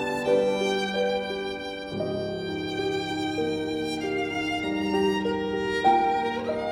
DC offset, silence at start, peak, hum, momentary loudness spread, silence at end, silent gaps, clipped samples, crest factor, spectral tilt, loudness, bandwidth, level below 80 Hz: under 0.1%; 0 s; -8 dBFS; none; 8 LU; 0 s; none; under 0.1%; 18 dB; -5 dB/octave; -27 LUFS; 15.5 kHz; -56 dBFS